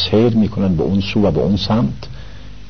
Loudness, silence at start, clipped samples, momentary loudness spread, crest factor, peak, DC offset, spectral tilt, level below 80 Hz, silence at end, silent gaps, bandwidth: -16 LUFS; 0 s; under 0.1%; 17 LU; 14 dB; -2 dBFS; 2%; -8 dB/octave; -34 dBFS; 0 s; none; 6.6 kHz